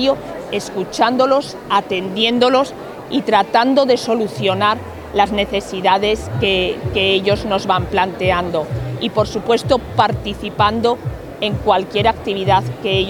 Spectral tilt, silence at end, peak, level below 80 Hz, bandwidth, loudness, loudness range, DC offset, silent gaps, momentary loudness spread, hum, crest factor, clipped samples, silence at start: -5.5 dB/octave; 0 s; 0 dBFS; -38 dBFS; 19 kHz; -17 LUFS; 2 LU; under 0.1%; none; 9 LU; none; 16 dB; under 0.1%; 0 s